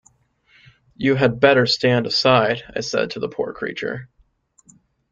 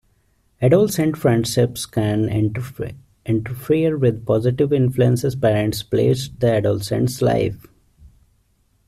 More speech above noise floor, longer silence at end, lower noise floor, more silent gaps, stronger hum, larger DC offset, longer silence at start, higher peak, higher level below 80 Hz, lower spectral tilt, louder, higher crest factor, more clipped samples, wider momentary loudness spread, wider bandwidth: about the same, 40 dB vs 43 dB; first, 1.05 s vs 0.8 s; about the same, -59 dBFS vs -62 dBFS; neither; neither; neither; first, 1 s vs 0.6 s; about the same, -2 dBFS vs -4 dBFS; second, -56 dBFS vs -48 dBFS; second, -5 dB/octave vs -6.5 dB/octave; about the same, -19 LUFS vs -19 LUFS; about the same, 20 dB vs 16 dB; neither; first, 12 LU vs 7 LU; second, 7.8 kHz vs 14.5 kHz